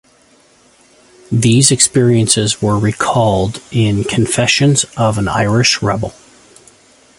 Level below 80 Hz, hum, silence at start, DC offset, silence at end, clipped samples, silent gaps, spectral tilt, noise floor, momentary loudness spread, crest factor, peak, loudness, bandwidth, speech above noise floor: -40 dBFS; none; 1.3 s; under 0.1%; 1.05 s; under 0.1%; none; -4 dB/octave; -50 dBFS; 8 LU; 14 dB; 0 dBFS; -13 LUFS; 11.5 kHz; 37 dB